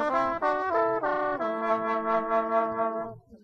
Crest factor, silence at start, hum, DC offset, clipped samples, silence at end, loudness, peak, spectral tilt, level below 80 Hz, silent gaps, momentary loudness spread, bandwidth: 14 dB; 0 s; none; under 0.1%; under 0.1%; 0.05 s; -27 LUFS; -12 dBFS; -6.5 dB/octave; -60 dBFS; none; 4 LU; 7.4 kHz